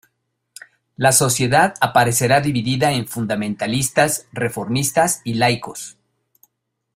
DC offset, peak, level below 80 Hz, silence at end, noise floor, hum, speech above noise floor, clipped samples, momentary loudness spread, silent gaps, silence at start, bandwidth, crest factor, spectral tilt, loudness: under 0.1%; 0 dBFS; -52 dBFS; 1.05 s; -73 dBFS; none; 55 dB; under 0.1%; 9 LU; none; 1 s; 16 kHz; 18 dB; -4 dB/octave; -18 LUFS